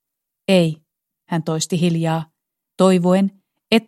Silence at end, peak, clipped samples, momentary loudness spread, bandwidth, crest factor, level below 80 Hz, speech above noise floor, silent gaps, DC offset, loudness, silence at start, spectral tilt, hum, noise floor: 0.05 s; 0 dBFS; under 0.1%; 11 LU; 13 kHz; 18 dB; -64 dBFS; 45 dB; none; under 0.1%; -19 LUFS; 0.5 s; -6 dB/octave; none; -61 dBFS